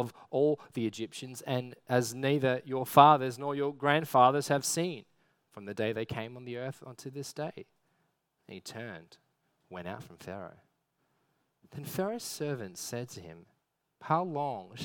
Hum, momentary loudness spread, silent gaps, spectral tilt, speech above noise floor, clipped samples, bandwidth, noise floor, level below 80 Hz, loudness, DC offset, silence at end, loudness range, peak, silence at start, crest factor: none; 21 LU; none; -5 dB/octave; 47 dB; under 0.1%; 19 kHz; -79 dBFS; -74 dBFS; -30 LUFS; under 0.1%; 0 s; 20 LU; -4 dBFS; 0 s; 28 dB